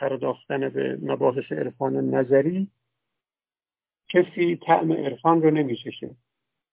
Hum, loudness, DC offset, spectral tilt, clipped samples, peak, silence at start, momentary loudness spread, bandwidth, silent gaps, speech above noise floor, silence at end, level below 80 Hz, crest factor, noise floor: none; -24 LUFS; under 0.1%; -11 dB/octave; under 0.1%; -6 dBFS; 0 s; 10 LU; 4 kHz; none; over 67 dB; 0.6 s; -72 dBFS; 20 dB; under -90 dBFS